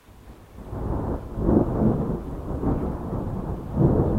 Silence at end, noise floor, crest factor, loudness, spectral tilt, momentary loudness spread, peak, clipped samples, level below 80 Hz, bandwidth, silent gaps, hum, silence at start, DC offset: 0 s; -46 dBFS; 20 dB; -26 LUFS; -11 dB/octave; 12 LU; -4 dBFS; under 0.1%; -32 dBFS; 15 kHz; none; none; 0.1 s; under 0.1%